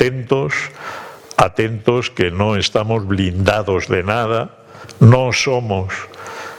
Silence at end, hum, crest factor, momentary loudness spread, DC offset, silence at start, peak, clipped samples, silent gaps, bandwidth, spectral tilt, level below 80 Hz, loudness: 0 s; none; 16 dB; 17 LU; under 0.1%; 0 s; 0 dBFS; under 0.1%; none; 12 kHz; -6 dB/octave; -44 dBFS; -16 LUFS